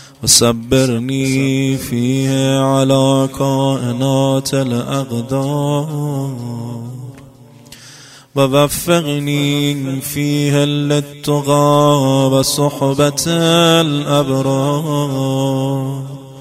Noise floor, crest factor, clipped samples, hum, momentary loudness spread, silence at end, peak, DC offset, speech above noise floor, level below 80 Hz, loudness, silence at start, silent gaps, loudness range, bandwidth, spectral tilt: -40 dBFS; 14 dB; under 0.1%; none; 10 LU; 0 s; 0 dBFS; under 0.1%; 26 dB; -46 dBFS; -15 LUFS; 0 s; none; 7 LU; 16 kHz; -5 dB/octave